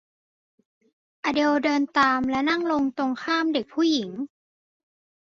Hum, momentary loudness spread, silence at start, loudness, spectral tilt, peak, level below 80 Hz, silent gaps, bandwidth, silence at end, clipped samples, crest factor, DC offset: none; 9 LU; 1.25 s; -23 LUFS; -4 dB/octave; -8 dBFS; -62 dBFS; none; 7.4 kHz; 0.95 s; under 0.1%; 18 dB; under 0.1%